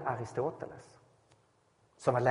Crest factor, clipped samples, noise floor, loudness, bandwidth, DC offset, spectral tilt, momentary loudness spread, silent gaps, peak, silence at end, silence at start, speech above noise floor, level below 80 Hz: 22 dB; under 0.1%; -70 dBFS; -35 LUFS; 10.5 kHz; under 0.1%; -7 dB/octave; 16 LU; none; -12 dBFS; 0 s; 0 s; 37 dB; -70 dBFS